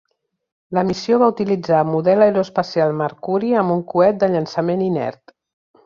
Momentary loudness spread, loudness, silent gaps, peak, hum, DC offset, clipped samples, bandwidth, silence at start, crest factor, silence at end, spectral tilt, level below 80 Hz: 7 LU; -18 LUFS; none; -2 dBFS; none; under 0.1%; under 0.1%; 7.4 kHz; 0.7 s; 16 dB; 0.75 s; -7.5 dB/octave; -58 dBFS